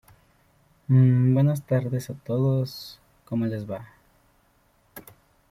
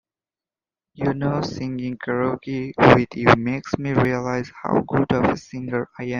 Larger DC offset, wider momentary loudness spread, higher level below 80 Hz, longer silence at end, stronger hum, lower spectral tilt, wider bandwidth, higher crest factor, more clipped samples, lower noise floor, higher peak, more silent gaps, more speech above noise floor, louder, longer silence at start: neither; first, 25 LU vs 12 LU; second, -60 dBFS vs -48 dBFS; first, 0.5 s vs 0 s; neither; first, -8.5 dB/octave vs -7 dB/octave; first, 15 kHz vs 7.4 kHz; about the same, 16 dB vs 20 dB; neither; second, -64 dBFS vs under -90 dBFS; second, -10 dBFS vs 0 dBFS; neither; second, 41 dB vs over 69 dB; second, -24 LUFS vs -21 LUFS; about the same, 0.9 s vs 1 s